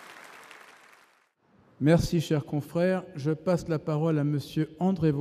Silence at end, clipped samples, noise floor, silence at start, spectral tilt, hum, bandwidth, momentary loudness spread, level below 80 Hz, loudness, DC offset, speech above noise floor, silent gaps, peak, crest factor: 0 s; under 0.1%; -65 dBFS; 0 s; -7.5 dB/octave; none; 15 kHz; 22 LU; -50 dBFS; -27 LUFS; under 0.1%; 39 dB; none; -10 dBFS; 18 dB